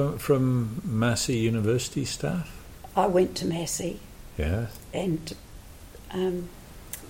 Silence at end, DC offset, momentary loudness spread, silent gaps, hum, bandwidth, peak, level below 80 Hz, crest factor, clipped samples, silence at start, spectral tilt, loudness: 0 s; under 0.1%; 19 LU; none; none; 17 kHz; -10 dBFS; -44 dBFS; 18 dB; under 0.1%; 0 s; -5.5 dB/octave; -27 LUFS